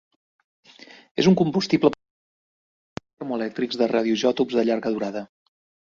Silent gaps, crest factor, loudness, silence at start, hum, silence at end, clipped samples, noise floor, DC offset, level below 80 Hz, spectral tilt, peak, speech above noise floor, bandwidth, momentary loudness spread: 1.11-1.15 s, 2.10-2.96 s, 3.13-3.17 s; 20 dB; -22 LUFS; 0.8 s; none; 0.65 s; under 0.1%; under -90 dBFS; under 0.1%; -62 dBFS; -6 dB/octave; -4 dBFS; over 69 dB; 7.4 kHz; 17 LU